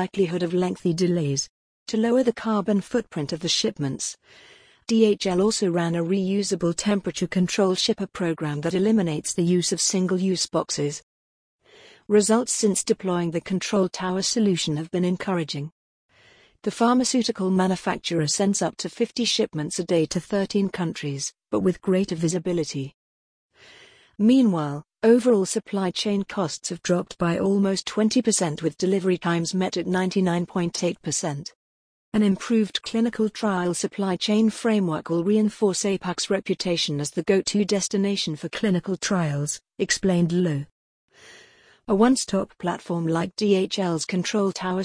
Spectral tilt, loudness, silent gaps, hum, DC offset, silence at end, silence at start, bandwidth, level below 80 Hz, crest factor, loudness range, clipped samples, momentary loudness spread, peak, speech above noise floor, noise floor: -4.5 dB/octave; -23 LUFS; 1.49-1.86 s, 11.03-11.59 s, 15.72-16.09 s, 22.94-23.49 s, 31.55-32.12 s, 40.71-41.08 s; none; under 0.1%; 0 s; 0 s; 10.5 kHz; -60 dBFS; 16 dB; 2 LU; under 0.1%; 7 LU; -6 dBFS; 33 dB; -56 dBFS